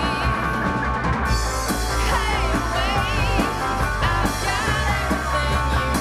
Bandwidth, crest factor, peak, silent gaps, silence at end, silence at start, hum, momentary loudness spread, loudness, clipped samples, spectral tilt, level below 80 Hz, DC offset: 15.5 kHz; 14 dB; -6 dBFS; none; 0 s; 0 s; none; 2 LU; -21 LUFS; under 0.1%; -4.5 dB/octave; -26 dBFS; under 0.1%